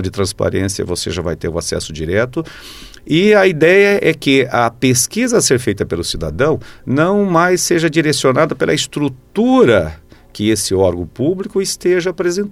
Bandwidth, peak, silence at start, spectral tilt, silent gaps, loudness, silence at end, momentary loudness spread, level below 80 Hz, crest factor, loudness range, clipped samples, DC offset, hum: 15.5 kHz; 0 dBFS; 0 s; -4.5 dB/octave; none; -14 LUFS; 0 s; 10 LU; -40 dBFS; 14 dB; 3 LU; under 0.1%; under 0.1%; none